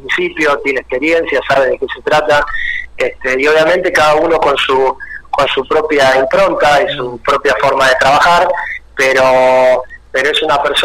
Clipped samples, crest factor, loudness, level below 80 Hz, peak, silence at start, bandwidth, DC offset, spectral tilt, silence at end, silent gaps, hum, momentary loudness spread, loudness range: under 0.1%; 10 dB; -11 LUFS; -38 dBFS; -2 dBFS; 0 s; 16 kHz; under 0.1%; -3.5 dB/octave; 0 s; none; none; 8 LU; 2 LU